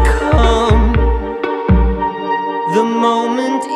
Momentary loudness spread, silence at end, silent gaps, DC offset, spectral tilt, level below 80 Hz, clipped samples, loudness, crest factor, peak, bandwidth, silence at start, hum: 7 LU; 0 s; none; under 0.1%; -6.5 dB/octave; -18 dBFS; under 0.1%; -15 LUFS; 14 dB; 0 dBFS; 11 kHz; 0 s; none